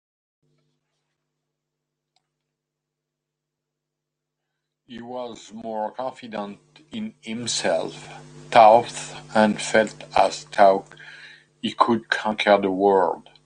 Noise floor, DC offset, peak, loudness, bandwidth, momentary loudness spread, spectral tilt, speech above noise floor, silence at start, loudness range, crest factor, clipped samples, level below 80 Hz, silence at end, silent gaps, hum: -83 dBFS; under 0.1%; -2 dBFS; -20 LUFS; 10 kHz; 19 LU; -4 dB/octave; 62 dB; 4.9 s; 16 LU; 22 dB; under 0.1%; -64 dBFS; 0.25 s; none; none